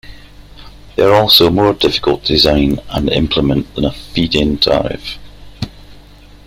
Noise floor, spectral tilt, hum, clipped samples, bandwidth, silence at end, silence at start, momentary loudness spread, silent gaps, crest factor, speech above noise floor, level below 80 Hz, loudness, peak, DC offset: -39 dBFS; -5.5 dB/octave; 50 Hz at -35 dBFS; under 0.1%; 16.5 kHz; 0.1 s; 0.05 s; 20 LU; none; 14 dB; 26 dB; -30 dBFS; -12 LUFS; 0 dBFS; under 0.1%